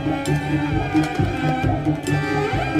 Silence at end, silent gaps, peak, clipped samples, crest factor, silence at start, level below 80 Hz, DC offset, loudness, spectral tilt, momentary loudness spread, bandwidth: 0 s; none; -8 dBFS; under 0.1%; 12 dB; 0 s; -36 dBFS; under 0.1%; -21 LUFS; -6.5 dB/octave; 2 LU; 14.5 kHz